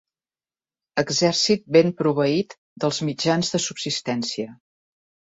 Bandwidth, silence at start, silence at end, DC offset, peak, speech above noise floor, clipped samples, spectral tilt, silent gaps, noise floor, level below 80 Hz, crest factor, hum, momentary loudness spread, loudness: 8 kHz; 0.95 s; 0.75 s; under 0.1%; -4 dBFS; over 68 dB; under 0.1%; -4 dB/octave; 2.58-2.76 s; under -90 dBFS; -62 dBFS; 20 dB; none; 11 LU; -22 LUFS